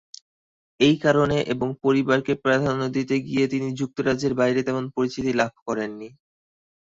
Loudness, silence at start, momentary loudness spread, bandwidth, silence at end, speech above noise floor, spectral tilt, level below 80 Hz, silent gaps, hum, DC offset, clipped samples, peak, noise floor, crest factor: -23 LUFS; 0.8 s; 9 LU; 7.8 kHz; 0.75 s; over 68 dB; -6 dB/octave; -54 dBFS; 5.62-5.66 s; none; under 0.1%; under 0.1%; -4 dBFS; under -90 dBFS; 18 dB